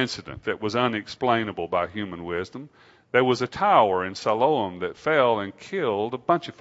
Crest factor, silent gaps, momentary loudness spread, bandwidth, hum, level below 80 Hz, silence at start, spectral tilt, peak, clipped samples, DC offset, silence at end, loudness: 20 dB; none; 11 LU; 8 kHz; none; -60 dBFS; 0 s; -5.5 dB/octave; -4 dBFS; under 0.1%; under 0.1%; 0.1 s; -24 LUFS